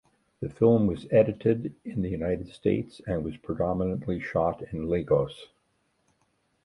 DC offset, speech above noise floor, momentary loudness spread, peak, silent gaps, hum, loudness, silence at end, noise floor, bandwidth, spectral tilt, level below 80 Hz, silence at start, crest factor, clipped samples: under 0.1%; 45 dB; 12 LU; -8 dBFS; none; none; -27 LUFS; 1.2 s; -72 dBFS; 11 kHz; -9 dB/octave; -50 dBFS; 0.4 s; 20 dB; under 0.1%